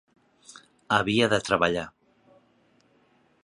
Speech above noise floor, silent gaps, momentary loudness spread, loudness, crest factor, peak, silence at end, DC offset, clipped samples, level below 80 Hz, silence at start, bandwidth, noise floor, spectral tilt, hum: 40 dB; none; 9 LU; -24 LUFS; 24 dB; -4 dBFS; 1.55 s; under 0.1%; under 0.1%; -58 dBFS; 0.9 s; 11.5 kHz; -64 dBFS; -4.5 dB/octave; none